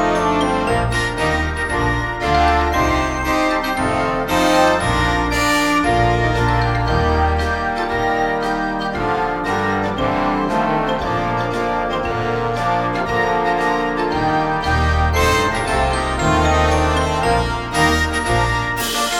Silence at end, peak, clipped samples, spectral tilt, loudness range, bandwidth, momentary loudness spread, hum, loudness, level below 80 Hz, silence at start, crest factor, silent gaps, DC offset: 0 s; -2 dBFS; under 0.1%; -5 dB/octave; 3 LU; 18 kHz; 5 LU; none; -17 LUFS; -28 dBFS; 0 s; 16 dB; none; under 0.1%